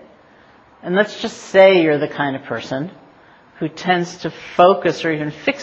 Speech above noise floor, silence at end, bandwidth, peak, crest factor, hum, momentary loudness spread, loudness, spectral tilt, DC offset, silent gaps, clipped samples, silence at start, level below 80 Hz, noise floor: 32 dB; 0 s; 8 kHz; 0 dBFS; 18 dB; none; 16 LU; -17 LUFS; -5.5 dB/octave; under 0.1%; none; under 0.1%; 0.85 s; -60 dBFS; -48 dBFS